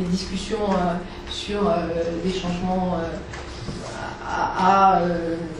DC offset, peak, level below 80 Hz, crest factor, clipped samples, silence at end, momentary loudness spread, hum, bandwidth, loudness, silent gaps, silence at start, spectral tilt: under 0.1%; -4 dBFS; -40 dBFS; 18 dB; under 0.1%; 0 s; 15 LU; none; 11 kHz; -23 LUFS; none; 0 s; -6 dB/octave